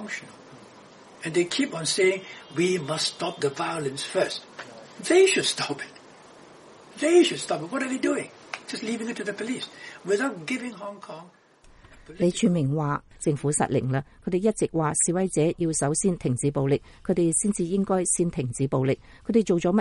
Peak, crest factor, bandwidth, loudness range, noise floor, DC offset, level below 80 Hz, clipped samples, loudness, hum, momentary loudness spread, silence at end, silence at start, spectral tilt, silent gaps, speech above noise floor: -8 dBFS; 18 dB; 11.5 kHz; 5 LU; -54 dBFS; under 0.1%; -56 dBFS; under 0.1%; -25 LUFS; none; 13 LU; 0 s; 0 s; -4.5 dB/octave; none; 29 dB